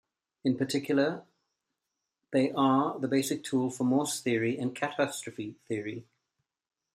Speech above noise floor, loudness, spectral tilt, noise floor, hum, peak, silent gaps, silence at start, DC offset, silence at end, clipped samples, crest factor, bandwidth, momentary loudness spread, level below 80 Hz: 57 dB; -30 LUFS; -5 dB/octave; -86 dBFS; none; -12 dBFS; none; 0.45 s; under 0.1%; 0.9 s; under 0.1%; 18 dB; 14.5 kHz; 11 LU; -74 dBFS